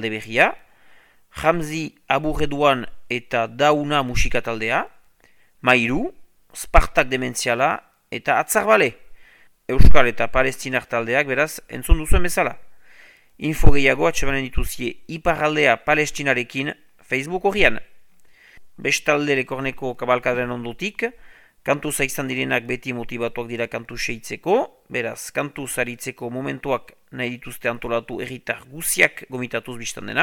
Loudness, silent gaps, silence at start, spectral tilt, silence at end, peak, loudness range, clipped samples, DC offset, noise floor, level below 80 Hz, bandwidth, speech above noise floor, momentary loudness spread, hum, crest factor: -22 LUFS; none; 0 s; -4 dB/octave; 0 s; 0 dBFS; 5 LU; under 0.1%; under 0.1%; -55 dBFS; -28 dBFS; 17.5 kHz; 37 dB; 11 LU; none; 20 dB